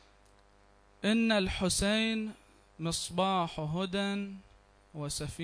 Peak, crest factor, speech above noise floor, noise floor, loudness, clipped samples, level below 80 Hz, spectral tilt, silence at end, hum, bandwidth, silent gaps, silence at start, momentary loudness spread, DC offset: -16 dBFS; 16 dB; 31 dB; -63 dBFS; -32 LUFS; under 0.1%; -52 dBFS; -4 dB/octave; 0 s; 50 Hz at -55 dBFS; 11 kHz; none; 1.05 s; 14 LU; under 0.1%